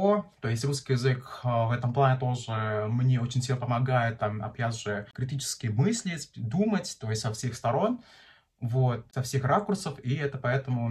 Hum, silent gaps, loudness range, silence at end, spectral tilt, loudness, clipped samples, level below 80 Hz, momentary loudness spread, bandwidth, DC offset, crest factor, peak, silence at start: none; none; 3 LU; 0 s; -6 dB/octave; -29 LUFS; under 0.1%; -60 dBFS; 7 LU; 13 kHz; under 0.1%; 16 dB; -12 dBFS; 0 s